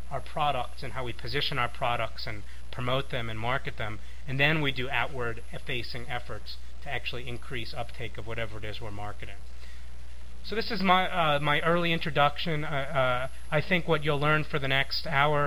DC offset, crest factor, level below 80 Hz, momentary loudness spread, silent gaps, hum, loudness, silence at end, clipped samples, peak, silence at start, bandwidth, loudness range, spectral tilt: 3%; 24 dB; -46 dBFS; 17 LU; none; none; -29 LUFS; 0 s; under 0.1%; -6 dBFS; 0 s; 16 kHz; 11 LU; -5.5 dB/octave